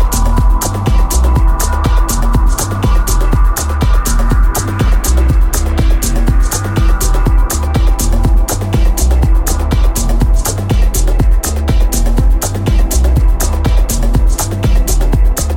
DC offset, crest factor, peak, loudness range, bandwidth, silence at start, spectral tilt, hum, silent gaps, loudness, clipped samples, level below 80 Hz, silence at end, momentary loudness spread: under 0.1%; 10 dB; 0 dBFS; 0 LU; 17 kHz; 0 s; -5 dB/octave; none; none; -13 LUFS; under 0.1%; -10 dBFS; 0 s; 2 LU